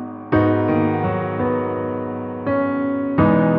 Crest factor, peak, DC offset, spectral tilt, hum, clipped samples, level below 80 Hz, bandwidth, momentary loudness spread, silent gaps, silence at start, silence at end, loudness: 16 dB; -4 dBFS; under 0.1%; -11.5 dB/octave; none; under 0.1%; -46 dBFS; 5 kHz; 8 LU; none; 0 s; 0 s; -20 LUFS